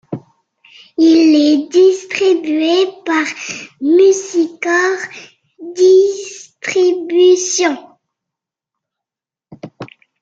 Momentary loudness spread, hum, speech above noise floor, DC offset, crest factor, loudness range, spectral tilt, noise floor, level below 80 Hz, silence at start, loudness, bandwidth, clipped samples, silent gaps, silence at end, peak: 20 LU; none; 75 dB; under 0.1%; 14 dB; 4 LU; -3 dB/octave; -88 dBFS; -66 dBFS; 0.1 s; -13 LUFS; 7.8 kHz; under 0.1%; none; 0.35 s; -2 dBFS